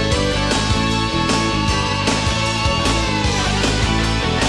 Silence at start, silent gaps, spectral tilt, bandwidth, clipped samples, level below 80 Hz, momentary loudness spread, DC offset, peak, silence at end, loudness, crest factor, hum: 0 s; none; -4 dB/octave; 12 kHz; under 0.1%; -26 dBFS; 1 LU; under 0.1%; -4 dBFS; 0 s; -17 LUFS; 14 dB; none